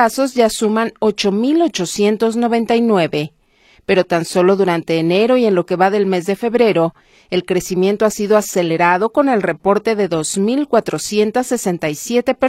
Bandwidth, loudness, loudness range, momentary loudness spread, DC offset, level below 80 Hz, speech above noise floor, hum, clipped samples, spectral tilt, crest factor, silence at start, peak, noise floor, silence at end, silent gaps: 16 kHz; -16 LUFS; 1 LU; 5 LU; under 0.1%; -52 dBFS; 37 dB; none; under 0.1%; -5 dB/octave; 14 dB; 0 s; 0 dBFS; -52 dBFS; 0 s; none